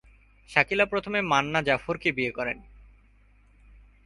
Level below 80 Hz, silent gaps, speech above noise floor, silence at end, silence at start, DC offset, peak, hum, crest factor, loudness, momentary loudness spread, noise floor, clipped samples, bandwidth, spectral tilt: -54 dBFS; none; 32 dB; 1.45 s; 0.5 s; under 0.1%; -4 dBFS; none; 24 dB; -25 LUFS; 8 LU; -58 dBFS; under 0.1%; 11.5 kHz; -4.5 dB/octave